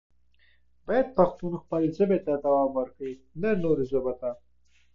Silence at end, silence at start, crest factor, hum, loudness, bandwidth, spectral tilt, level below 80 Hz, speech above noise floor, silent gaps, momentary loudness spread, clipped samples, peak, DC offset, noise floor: 0 s; 0.1 s; 20 dB; none; -27 LUFS; 7 kHz; -9.5 dB/octave; -56 dBFS; 40 dB; none; 12 LU; under 0.1%; -8 dBFS; under 0.1%; -66 dBFS